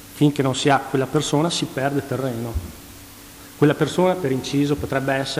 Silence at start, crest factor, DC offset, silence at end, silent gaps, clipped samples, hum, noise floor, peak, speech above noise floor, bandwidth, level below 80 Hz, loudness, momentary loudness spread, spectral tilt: 0 s; 16 dB; under 0.1%; 0 s; none; under 0.1%; none; -42 dBFS; -6 dBFS; 21 dB; 16 kHz; -42 dBFS; -21 LUFS; 21 LU; -5.5 dB/octave